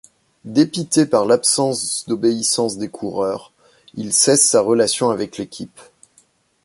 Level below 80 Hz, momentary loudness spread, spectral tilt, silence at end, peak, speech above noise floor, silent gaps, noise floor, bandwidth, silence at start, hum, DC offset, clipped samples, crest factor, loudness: -60 dBFS; 17 LU; -3.5 dB/octave; 0.85 s; -2 dBFS; 40 dB; none; -58 dBFS; 12 kHz; 0.45 s; none; under 0.1%; under 0.1%; 18 dB; -17 LUFS